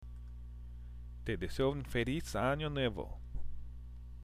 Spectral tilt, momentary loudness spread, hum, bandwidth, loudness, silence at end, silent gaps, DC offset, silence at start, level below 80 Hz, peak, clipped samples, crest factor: -6 dB/octave; 16 LU; 60 Hz at -45 dBFS; 15.5 kHz; -37 LUFS; 0 s; none; under 0.1%; 0 s; -46 dBFS; -20 dBFS; under 0.1%; 18 dB